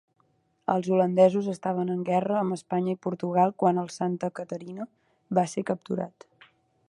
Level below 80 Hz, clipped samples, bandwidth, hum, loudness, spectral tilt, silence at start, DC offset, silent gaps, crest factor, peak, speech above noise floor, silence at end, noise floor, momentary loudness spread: -74 dBFS; under 0.1%; 11.5 kHz; none; -27 LUFS; -7.5 dB/octave; 0.7 s; under 0.1%; none; 20 dB; -8 dBFS; 43 dB; 0.8 s; -69 dBFS; 14 LU